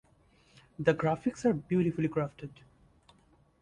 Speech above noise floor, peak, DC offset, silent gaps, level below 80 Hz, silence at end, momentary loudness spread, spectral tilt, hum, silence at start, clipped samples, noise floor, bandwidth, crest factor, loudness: 35 dB; -14 dBFS; under 0.1%; none; -62 dBFS; 1.1 s; 19 LU; -7.5 dB/octave; none; 0.8 s; under 0.1%; -65 dBFS; 10.5 kHz; 20 dB; -31 LUFS